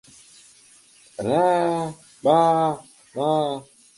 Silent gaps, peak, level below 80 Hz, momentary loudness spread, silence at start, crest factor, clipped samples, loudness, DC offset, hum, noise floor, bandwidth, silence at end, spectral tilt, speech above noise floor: none; -6 dBFS; -66 dBFS; 17 LU; 1.2 s; 18 dB; under 0.1%; -22 LUFS; under 0.1%; none; -53 dBFS; 11.5 kHz; 0.35 s; -6 dB/octave; 33 dB